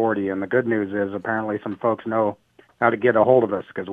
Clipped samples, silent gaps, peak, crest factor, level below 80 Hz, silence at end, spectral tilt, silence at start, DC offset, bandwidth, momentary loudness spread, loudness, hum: under 0.1%; none; -2 dBFS; 20 dB; -66 dBFS; 0 s; -9.5 dB/octave; 0 s; under 0.1%; 3.9 kHz; 8 LU; -22 LUFS; none